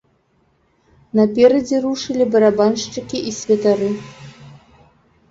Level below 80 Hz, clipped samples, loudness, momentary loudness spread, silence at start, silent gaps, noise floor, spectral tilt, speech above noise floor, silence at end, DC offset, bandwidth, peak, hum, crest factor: -56 dBFS; under 0.1%; -17 LUFS; 11 LU; 1.15 s; none; -61 dBFS; -5 dB/octave; 45 dB; 0.75 s; under 0.1%; 7.8 kHz; -2 dBFS; none; 16 dB